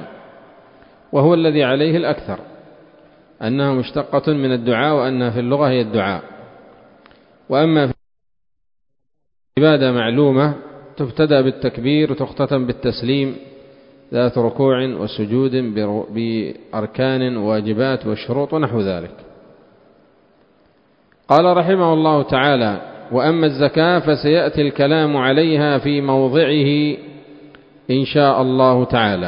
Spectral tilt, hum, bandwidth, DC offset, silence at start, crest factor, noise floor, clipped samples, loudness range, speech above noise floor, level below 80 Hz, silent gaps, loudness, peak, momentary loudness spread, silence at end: -9.5 dB/octave; none; 5.4 kHz; under 0.1%; 0 s; 18 dB; -75 dBFS; under 0.1%; 5 LU; 59 dB; -50 dBFS; none; -17 LUFS; 0 dBFS; 10 LU; 0 s